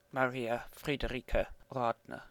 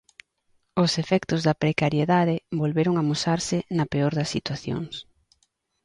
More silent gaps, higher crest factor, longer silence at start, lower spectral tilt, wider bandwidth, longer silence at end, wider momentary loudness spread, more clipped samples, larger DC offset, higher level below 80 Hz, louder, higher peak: neither; about the same, 22 dB vs 18 dB; second, 0.15 s vs 0.75 s; about the same, -6 dB/octave vs -5.5 dB/octave; first, 19.5 kHz vs 11 kHz; second, 0 s vs 0.8 s; second, 5 LU vs 9 LU; neither; neither; first, -46 dBFS vs -56 dBFS; second, -36 LUFS vs -24 LUFS; second, -14 dBFS vs -6 dBFS